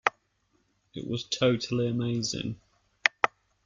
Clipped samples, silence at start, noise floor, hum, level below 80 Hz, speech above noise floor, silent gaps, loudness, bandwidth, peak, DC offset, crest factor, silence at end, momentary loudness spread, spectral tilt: under 0.1%; 0.05 s; -72 dBFS; none; -64 dBFS; 43 dB; none; -29 LUFS; 7.6 kHz; -2 dBFS; under 0.1%; 28 dB; 0.4 s; 13 LU; -4.5 dB/octave